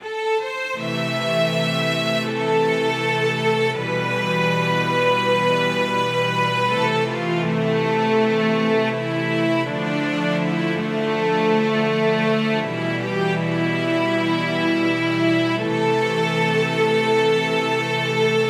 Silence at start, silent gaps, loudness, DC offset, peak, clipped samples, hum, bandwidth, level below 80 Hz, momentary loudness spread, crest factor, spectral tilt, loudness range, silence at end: 0 s; none; -20 LUFS; under 0.1%; -6 dBFS; under 0.1%; none; 15.5 kHz; -72 dBFS; 4 LU; 14 dB; -5.5 dB/octave; 1 LU; 0 s